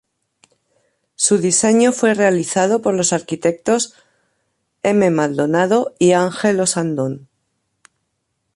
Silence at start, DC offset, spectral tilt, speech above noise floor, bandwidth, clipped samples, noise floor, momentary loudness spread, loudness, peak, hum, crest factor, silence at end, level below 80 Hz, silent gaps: 1.2 s; under 0.1%; -4 dB/octave; 56 dB; 11.5 kHz; under 0.1%; -72 dBFS; 7 LU; -16 LUFS; -2 dBFS; none; 16 dB; 1.4 s; -62 dBFS; none